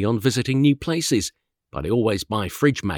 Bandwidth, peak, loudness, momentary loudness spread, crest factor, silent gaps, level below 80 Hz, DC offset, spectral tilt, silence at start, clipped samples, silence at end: 19.5 kHz; -4 dBFS; -22 LUFS; 10 LU; 16 dB; none; -48 dBFS; under 0.1%; -5.5 dB/octave; 0 s; under 0.1%; 0 s